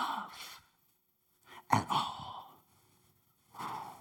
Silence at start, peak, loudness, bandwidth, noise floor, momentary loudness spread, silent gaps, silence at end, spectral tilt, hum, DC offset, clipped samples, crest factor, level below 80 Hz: 0 s; -12 dBFS; -37 LUFS; 19 kHz; -75 dBFS; 24 LU; none; 0 s; -4 dB/octave; none; under 0.1%; under 0.1%; 28 dB; -72 dBFS